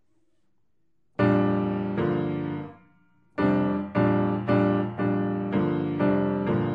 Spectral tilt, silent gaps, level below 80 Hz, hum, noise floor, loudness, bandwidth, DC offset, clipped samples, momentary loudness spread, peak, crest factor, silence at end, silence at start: -10.5 dB/octave; none; -56 dBFS; none; -76 dBFS; -25 LUFS; 5.2 kHz; under 0.1%; under 0.1%; 8 LU; -8 dBFS; 16 dB; 0 s; 1.2 s